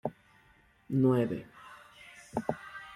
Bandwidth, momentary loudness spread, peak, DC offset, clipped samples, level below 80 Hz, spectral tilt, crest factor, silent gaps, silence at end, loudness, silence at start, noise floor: 12.5 kHz; 24 LU; -14 dBFS; under 0.1%; under 0.1%; -66 dBFS; -8.5 dB/octave; 20 dB; none; 0 s; -32 LUFS; 0.05 s; -64 dBFS